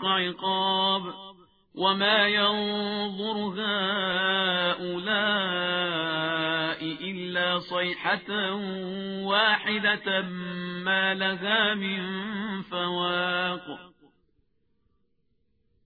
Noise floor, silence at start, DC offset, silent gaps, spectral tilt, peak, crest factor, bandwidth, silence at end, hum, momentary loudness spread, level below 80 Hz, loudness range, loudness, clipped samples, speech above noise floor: -74 dBFS; 0 s; under 0.1%; none; -6.5 dB/octave; -8 dBFS; 20 dB; 5 kHz; 1.95 s; none; 10 LU; -68 dBFS; 4 LU; -26 LUFS; under 0.1%; 47 dB